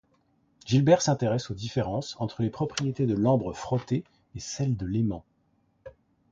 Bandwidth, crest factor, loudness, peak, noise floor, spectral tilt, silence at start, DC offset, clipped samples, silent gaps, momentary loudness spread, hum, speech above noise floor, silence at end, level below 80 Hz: 7.8 kHz; 20 dB; -27 LUFS; -8 dBFS; -69 dBFS; -6 dB/octave; 0.65 s; under 0.1%; under 0.1%; none; 13 LU; none; 42 dB; 0.4 s; -54 dBFS